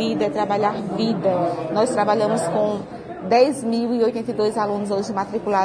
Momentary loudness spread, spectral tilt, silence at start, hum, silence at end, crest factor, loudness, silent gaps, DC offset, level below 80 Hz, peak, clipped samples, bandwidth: 6 LU; -5.5 dB/octave; 0 s; none; 0 s; 16 dB; -21 LUFS; none; under 0.1%; -58 dBFS; -4 dBFS; under 0.1%; 10.5 kHz